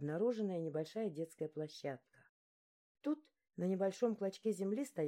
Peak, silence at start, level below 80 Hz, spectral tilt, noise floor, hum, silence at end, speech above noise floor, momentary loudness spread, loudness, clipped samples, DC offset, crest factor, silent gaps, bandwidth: -24 dBFS; 0 s; under -90 dBFS; -7 dB/octave; under -90 dBFS; none; 0 s; over 50 dB; 9 LU; -41 LUFS; under 0.1%; under 0.1%; 18 dB; 2.29-2.95 s; 16 kHz